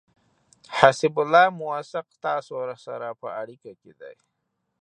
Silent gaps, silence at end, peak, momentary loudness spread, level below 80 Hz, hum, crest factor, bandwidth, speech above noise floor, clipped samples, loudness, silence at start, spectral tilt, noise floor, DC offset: none; 0.7 s; 0 dBFS; 16 LU; -68 dBFS; none; 24 dB; 9.8 kHz; 36 dB; under 0.1%; -23 LUFS; 0.7 s; -4.5 dB/octave; -60 dBFS; under 0.1%